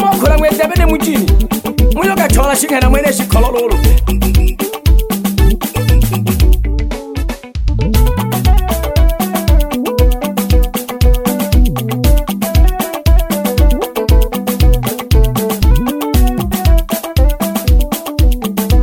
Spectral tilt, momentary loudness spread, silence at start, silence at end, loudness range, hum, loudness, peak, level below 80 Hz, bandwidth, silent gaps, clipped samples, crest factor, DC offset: -5.5 dB/octave; 5 LU; 0 s; 0 s; 3 LU; none; -13 LUFS; 0 dBFS; -12 dBFS; 17 kHz; none; under 0.1%; 10 dB; under 0.1%